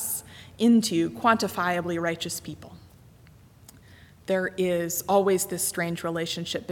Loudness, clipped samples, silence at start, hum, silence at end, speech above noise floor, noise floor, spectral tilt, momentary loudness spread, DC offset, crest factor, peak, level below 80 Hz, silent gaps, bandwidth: -25 LUFS; under 0.1%; 0 s; none; 0 s; 27 dB; -53 dBFS; -4 dB/octave; 11 LU; under 0.1%; 20 dB; -8 dBFS; -60 dBFS; none; 18.5 kHz